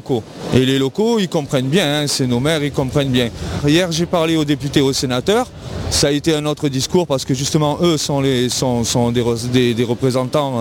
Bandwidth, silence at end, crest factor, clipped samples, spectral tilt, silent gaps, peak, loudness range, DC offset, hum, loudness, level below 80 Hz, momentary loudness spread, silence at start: 17.5 kHz; 0 s; 16 dB; under 0.1%; -5 dB/octave; none; -2 dBFS; 1 LU; under 0.1%; none; -17 LUFS; -40 dBFS; 3 LU; 0.05 s